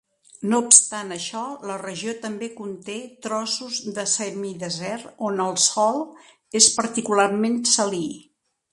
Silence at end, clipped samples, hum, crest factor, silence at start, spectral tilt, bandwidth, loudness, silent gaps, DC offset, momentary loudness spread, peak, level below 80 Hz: 0.5 s; under 0.1%; none; 24 dB; 0.4 s; -2 dB/octave; 13 kHz; -21 LUFS; none; under 0.1%; 17 LU; 0 dBFS; -70 dBFS